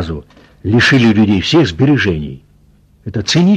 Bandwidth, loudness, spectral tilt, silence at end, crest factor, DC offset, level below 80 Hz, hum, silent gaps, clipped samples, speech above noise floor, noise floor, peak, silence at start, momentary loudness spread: 9.8 kHz; -12 LUFS; -5.5 dB/octave; 0 s; 12 dB; under 0.1%; -38 dBFS; none; none; under 0.1%; 37 dB; -48 dBFS; -2 dBFS; 0 s; 17 LU